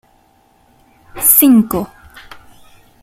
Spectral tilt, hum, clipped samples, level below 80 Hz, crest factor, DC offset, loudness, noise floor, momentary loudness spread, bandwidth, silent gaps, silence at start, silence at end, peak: -4 dB/octave; none; under 0.1%; -46 dBFS; 16 dB; under 0.1%; -10 LUFS; -53 dBFS; 15 LU; 16.5 kHz; none; 1.15 s; 1.15 s; 0 dBFS